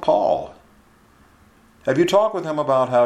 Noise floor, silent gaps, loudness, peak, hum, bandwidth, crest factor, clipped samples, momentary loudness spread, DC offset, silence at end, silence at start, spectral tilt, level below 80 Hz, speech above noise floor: -53 dBFS; none; -20 LUFS; -4 dBFS; none; 13.5 kHz; 18 dB; under 0.1%; 10 LU; under 0.1%; 0 s; 0 s; -6 dB/octave; -58 dBFS; 35 dB